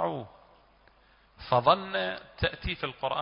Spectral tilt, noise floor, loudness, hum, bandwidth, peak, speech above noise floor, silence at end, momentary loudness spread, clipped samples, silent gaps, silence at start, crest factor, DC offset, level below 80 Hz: -9 dB/octave; -62 dBFS; -29 LUFS; none; 5.4 kHz; -8 dBFS; 32 dB; 0 s; 16 LU; under 0.1%; none; 0 s; 22 dB; under 0.1%; -48 dBFS